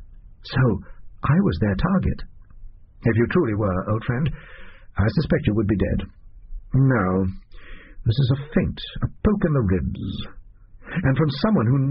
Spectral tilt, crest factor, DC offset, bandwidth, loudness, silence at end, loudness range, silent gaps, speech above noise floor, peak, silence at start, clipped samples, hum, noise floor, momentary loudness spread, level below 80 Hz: -7 dB/octave; 16 dB; under 0.1%; 5.6 kHz; -22 LUFS; 0 s; 2 LU; none; 23 dB; -6 dBFS; 0 s; under 0.1%; none; -43 dBFS; 11 LU; -36 dBFS